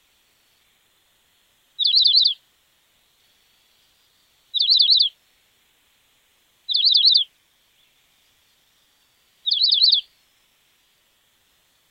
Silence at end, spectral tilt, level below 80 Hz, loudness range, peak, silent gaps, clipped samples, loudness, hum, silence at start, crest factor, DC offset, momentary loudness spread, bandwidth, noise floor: 1.9 s; 2.5 dB/octave; -80 dBFS; 4 LU; -4 dBFS; none; under 0.1%; -15 LUFS; none; 1.8 s; 20 dB; under 0.1%; 15 LU; 16 kHz; -63 dBFS